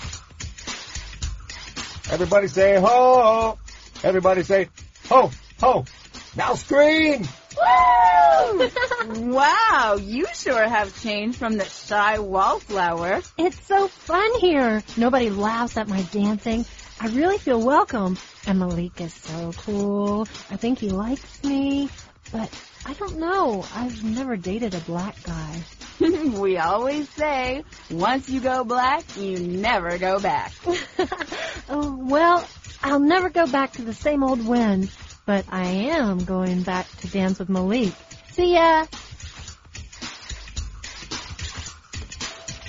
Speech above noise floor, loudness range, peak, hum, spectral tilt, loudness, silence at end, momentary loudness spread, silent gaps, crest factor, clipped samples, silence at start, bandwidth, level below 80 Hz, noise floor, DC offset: 19 dB; 8 LU; -4 dBFS; none; -4 dB/octave; -21 LUFS; 0 s; 18 LU; none; 18 dB; under 0.1%; 0 s; 7.6 kHz; -44 dBFS; -40 dBFS; under 0.1%